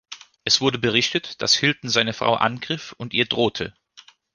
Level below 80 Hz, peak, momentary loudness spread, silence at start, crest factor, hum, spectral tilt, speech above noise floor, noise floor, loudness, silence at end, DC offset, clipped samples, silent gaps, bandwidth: -58 dBFS; -2 dBFS; 12 LU; 0.1 s; 22 dB; none; -3 dB/octave; 29 dB; -51 dBFS; -21 LUFS; 0.35 s; under 0.1%; under 0.1%; none; 10.5 kHz